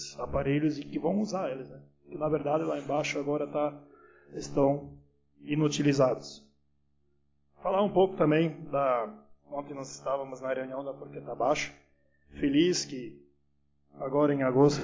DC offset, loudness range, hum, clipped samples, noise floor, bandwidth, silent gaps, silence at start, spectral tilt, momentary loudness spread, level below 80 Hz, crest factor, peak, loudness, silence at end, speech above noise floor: under 0.1%; 4 LU; none; under 0.1%; -74 dBFS; 7.6 kHz; none; 0 s; -6 dB/octave; 16 LU; -58 dBFS; 20 dB; -10 dBFS; -30 LUFS; 0 s; 45 dB